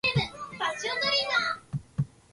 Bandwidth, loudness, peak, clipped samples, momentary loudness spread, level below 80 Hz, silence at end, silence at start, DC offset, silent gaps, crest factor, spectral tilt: 11.5 kHz; -28 LUFS; -14 dBFS; under 0.1%; 11 LU; -56 dBFS; 0.25 s; 0.05 s; under 0.1%; none; 16 dB; -4 dB/octave